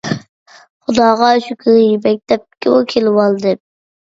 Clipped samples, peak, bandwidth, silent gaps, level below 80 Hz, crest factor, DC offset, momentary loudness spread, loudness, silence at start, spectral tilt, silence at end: under 0.1%; 0 dBFS; 7.8 kHz; 0.29-0.46 s, 0.70-0.80 s; -56 dBFS; 14 dB; under 0.1%; 11 LU; -13 LUFS; 0.05 s; -6 dB/octave; 0.5 s